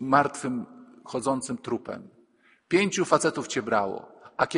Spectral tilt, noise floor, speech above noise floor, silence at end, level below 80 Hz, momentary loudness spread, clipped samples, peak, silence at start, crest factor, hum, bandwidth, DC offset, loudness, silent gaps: -4.5 dB/octave; -62 dBFS; 36 dB; 0 s; -68 dBFS; 17 LU; under 0.1%; -4 dBFS; 0 s; 24 dB; none; 10.5 kHz; under 0.1%; -27 LUFS; none